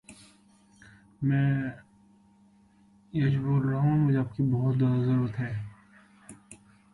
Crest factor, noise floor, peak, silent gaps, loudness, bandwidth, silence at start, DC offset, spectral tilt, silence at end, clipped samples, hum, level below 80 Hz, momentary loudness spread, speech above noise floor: 14 dB; -60 dBFS; -16 dBFS; none; -27 LUFS; 11 kHz; 0.1 s; under 0.1%; -9 dB/octave; 0.4 s; under 0.1%; none; -58 dBFS; 11 LU; 35 dB